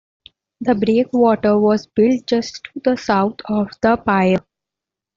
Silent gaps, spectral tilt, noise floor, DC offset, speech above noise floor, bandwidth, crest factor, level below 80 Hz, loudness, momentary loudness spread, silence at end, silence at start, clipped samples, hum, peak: none; -6.5 dB/octave; -86 dBFS; under 0.1%; 69 dB; 7.4 kHz; 16 dB; -52 dBFS; -17 LUFS; 7 LU; 0.75 s; 0.6 s; under 0.1%; none; -2 dBFS